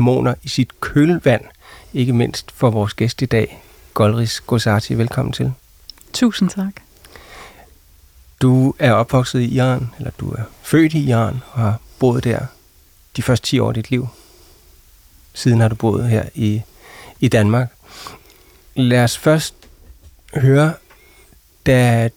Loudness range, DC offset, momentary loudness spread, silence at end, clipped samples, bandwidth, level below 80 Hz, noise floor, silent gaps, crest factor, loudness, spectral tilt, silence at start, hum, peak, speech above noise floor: 3 LU; under 0.1%; 13 LU; 0.05 s; under 0.1%; 17.5 kHz; -44 dBFS; -50 dBFS; none; 16 dB; -17 LUFS; -6.5 dB/octave; 0 s; none; -2 dBFS; 34 dB